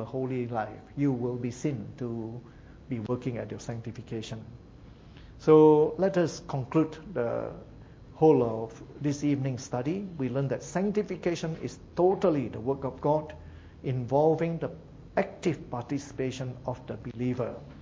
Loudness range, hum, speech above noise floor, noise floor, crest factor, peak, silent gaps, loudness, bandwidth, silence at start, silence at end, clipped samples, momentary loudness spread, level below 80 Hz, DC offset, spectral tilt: 8 LU; none; 21 dB; -50 dBFS; 22 dB; -6 dBFS; none; -29 LUFS; 7.8 kHz; 0 s; 0 s; under 0.1%; 15 LU; -56 dBFS; under 0.1%; -7.5 dB/octave